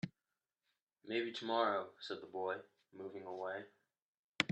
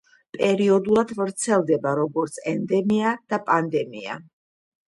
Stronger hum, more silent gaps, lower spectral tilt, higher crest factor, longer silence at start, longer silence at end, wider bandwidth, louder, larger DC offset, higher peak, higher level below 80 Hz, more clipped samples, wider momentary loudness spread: neither; first, 0.82-0.87 s, 4.02-4.35 s vs none; about the same, -4.5 dB/octave vs -5.5 dB/octave; first, 32 dB vs 18 dB; second, 0.05 s vs 0.35 s; second, 0.05 s vs 0.65 s; second, 10 kHz vs 11.5 kHz; second, -42 LUFS vs -22 LUFS; neither; second, -12 dBFS vs -6 dBFS; second, -88 dBFS vs -64 dBFS; neither; first, 16 LU vs 12 LU